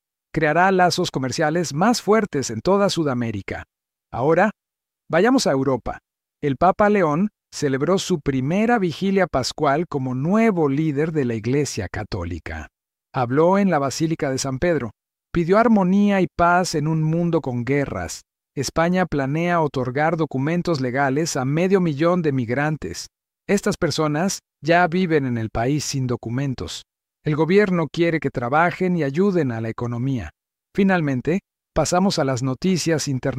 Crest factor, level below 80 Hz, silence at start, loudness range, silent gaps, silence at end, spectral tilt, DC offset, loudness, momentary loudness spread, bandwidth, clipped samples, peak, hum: 16 dB; -48 dBFS; 0.35 s; 3 LU; none; 0 s; -5.5 dB/octave; under 0.1%; -21 LUFS; 11 LU; 15.5 kHz; under 0.1%; -4 dBFS; none